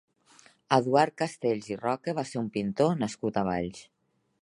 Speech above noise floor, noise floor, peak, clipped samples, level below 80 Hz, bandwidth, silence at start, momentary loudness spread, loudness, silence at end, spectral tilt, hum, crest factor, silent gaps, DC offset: 31 dB; -59 dBFS; -6 dBFS; under 0.1%; -62 dBFS; 11.5 kHz; 0.7 s; 8 LU; -29 LUFS; 0.6 s; -6 dB/octave; none; 22 dB; none; under 0.1%